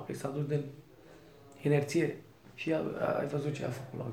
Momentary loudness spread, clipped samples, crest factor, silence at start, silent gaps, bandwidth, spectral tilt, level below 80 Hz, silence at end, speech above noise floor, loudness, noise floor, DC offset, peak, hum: 15 LU; under 0.1%; 20 dB; 0 s; none; 15.5 kHz; -7 dB/octave; -70 dBFS; 0 s; 23 dB; -34 LUFS; -56 dBFS; under 0.1%; -14 dBFS; none